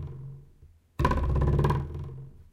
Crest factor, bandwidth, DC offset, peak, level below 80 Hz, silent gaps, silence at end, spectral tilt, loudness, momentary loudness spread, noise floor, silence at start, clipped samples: 20 dB; 11 kHz; under 0.1%; -8 dBFS; -34 dBFS; none; 0.1 s; -8 dB/octave; -28 LUFS; 20 LU; -56 dBFS; 0 s; under 0.1%